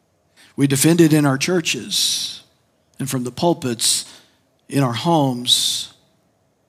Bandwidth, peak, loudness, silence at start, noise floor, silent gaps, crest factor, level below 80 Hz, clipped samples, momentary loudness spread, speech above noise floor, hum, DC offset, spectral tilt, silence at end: 16 kHz; -2 dBFS; -18 LUFS; 0.6 s; -63 dBFS; none; 18 dB; -66 dBFS; under 0.1%; 13 LU; 45 dB; none; under 0.1%; -4 dB/octave; 0.8 s